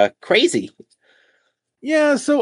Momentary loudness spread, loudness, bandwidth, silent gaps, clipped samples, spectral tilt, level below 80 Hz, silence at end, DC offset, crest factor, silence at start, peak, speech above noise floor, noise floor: 16 LU; -17 LUFS; 11 kHz; none; under 0.1%; -3.5 dB/octave; -72 dBFS; 0 s; under 0.1%; 18 dB; 0 s; 0 dBFS; 49 dB; -67 dBFS